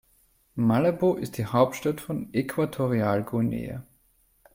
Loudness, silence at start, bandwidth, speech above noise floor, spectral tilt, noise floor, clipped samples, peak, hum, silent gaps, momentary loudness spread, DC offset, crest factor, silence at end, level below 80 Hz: -26 LUFS; 0.55 s; 16.5 kHz; 40 dB; -7.5 dB/octave; -65 dBFS; under 0.1%; -6 dBFS; none; none; 10 LU; under 0.1%; 20 dB; 0.75 s; -56 dBFS